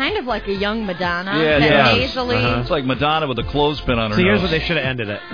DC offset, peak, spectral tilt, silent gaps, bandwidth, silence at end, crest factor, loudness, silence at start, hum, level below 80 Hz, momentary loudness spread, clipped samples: 0.5%; 0 dBFS; -6.5 dB/octave; none; 5.2 kHz; 0 s; 18 dB; -18 LUFS; 0 s; none; -34 dBFS; 8 LU; under 0.1%